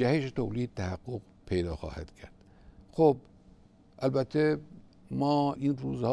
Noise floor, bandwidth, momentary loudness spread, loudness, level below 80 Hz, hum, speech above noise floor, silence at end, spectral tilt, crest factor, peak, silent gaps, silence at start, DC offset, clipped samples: -58 dBFS; 11 kHz; 15 LU; -31 LUFS; -52 dBFS; none; 28 dB; 0 s; -8 dB/octave; 20 dB; -10 dBFS; none; 0 s; under 0.1%; under 0.1%